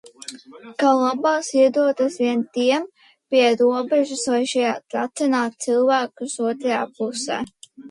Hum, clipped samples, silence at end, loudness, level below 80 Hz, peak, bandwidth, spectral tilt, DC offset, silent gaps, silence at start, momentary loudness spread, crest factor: none; under 0.1%; 0 s; -20 LUFS; -70 dBFS; -6 dBFS; 11.5 kHz; -3 dB/octave; under 0.1%; none; 0.05 s; 10 LU; 16 dB